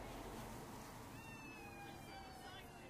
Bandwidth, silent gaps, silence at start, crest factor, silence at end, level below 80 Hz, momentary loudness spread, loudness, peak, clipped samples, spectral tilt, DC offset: 15.5 kHz; none; 0 s; 14 dB; 0 s; -64 dBFS; 3 LU; -53 LUFS; -40 dBFS; under 0.1%; -4.5 dB/octave; under 0.1%